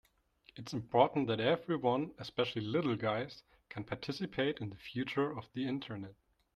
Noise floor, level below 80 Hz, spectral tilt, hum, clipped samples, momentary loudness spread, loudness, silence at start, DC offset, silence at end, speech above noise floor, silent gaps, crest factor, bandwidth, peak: -67 dBFS; -70 dBFS; -6.5 dB/octave; none; under 0.1%; 16 LU; -36 LUFS; 0.55 s; under 0.1%; 0.4 s; 32 dB; none; 22 dB; 12.5 kHz; -14 dBFS